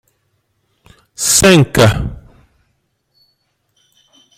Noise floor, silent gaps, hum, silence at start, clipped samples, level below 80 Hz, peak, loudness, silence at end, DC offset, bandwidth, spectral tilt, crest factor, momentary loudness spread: -65 dBFS; none; none; 1.2 s; under 0.1%; -36 dBFS; 0 dBFS; -10 LUFS; 2.25 s; under 0.1%; 16.5 kHz; -4 dB/octave; 16 dB; 14 LU